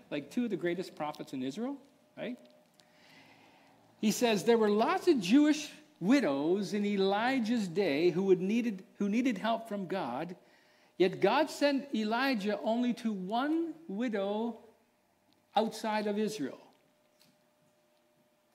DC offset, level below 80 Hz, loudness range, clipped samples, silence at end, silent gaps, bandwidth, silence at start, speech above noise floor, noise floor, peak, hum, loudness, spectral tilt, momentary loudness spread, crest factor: under 0.1%; -84 dBFS; 9 LU; under 0.1%; 1.95 s; none; 16 kHz; 0.1 s; 40 dB; -71 dBFS; -14 dBFS; none; -32 LUFS; -5.5 dB/octave; 13 LU; 18 dB